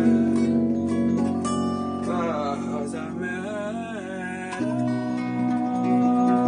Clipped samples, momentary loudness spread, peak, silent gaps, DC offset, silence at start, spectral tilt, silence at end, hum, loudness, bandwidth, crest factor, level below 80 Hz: under 0.1%; 10 LU; -10 dBFS; none; under 0.1%; 0 s; -7 dB/octave; 0 s; none; -25 LUFS; 10 kHz; 14 dB; -60 dBFS